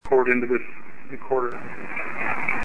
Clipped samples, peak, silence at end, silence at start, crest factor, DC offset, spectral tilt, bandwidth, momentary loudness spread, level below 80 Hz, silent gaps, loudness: under 0.1%; -6 dBFS; 0 s; 0 s; 20 dB; 4%; -7.5 dB/octave; 9.8 kHz; 20 LU; -54 dBFS; none; -25 LUFS